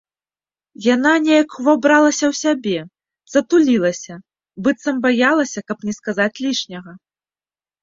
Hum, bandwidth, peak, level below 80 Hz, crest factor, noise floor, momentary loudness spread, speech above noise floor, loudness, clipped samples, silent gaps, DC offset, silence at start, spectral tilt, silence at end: none; 7.8 kHz; -2 dBFS; -62 dBFS; 16 dB; under -90 dBFS; 12 LU; over 73 dB; -17 LUFS; under 0.1%; none; under 0.1%; 0.8 s; -4 dB/octave; 0.85 s